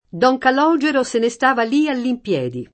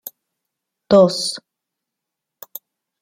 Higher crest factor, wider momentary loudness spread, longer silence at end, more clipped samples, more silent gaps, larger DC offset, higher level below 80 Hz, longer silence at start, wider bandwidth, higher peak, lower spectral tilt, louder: about the same, 16 dB vs 20 dB; second, 7 LU vs 23 LU; second, 0.1 s vs 1.6 s; neither; neither; neither; about the same, -60 dBFS vs -60 dBFS; second, 0.15 s vs 0.9 s; second, 8.8 kHz vs 16.5 kHz; about the same, -2 dBFS vs -2 dBFS; about the same, -5 dB/octave vs -5 dB/octave; about the same, -17 LUFS vs -16 LUFS